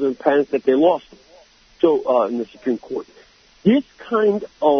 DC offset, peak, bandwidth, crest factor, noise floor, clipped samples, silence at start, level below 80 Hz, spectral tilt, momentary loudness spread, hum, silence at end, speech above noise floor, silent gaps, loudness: under 0.1%; -2 dBFS; 6.4 kHz; 18 dB; -51 dBFS; under 0.1%; 0 s; -60 dBFS; -7.5 dB/octave; 9 LU; none; 0 s; 32 dB; none; -19 LUFS